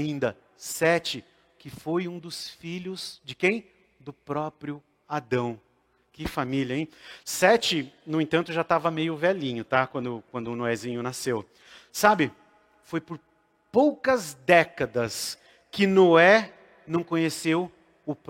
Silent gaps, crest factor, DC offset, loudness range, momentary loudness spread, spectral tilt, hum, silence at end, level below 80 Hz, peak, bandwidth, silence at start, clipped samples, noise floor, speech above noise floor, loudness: none; 24 dB; under 0.1%; 10 LU; 17 LU; -4.5 dB/octave; none; 0.15 s; -60 dBFS; -2 dBFS; 16.5 kHz; 0 s; under 0.1%; -65 dBFS; 39 dB; -25 LUFS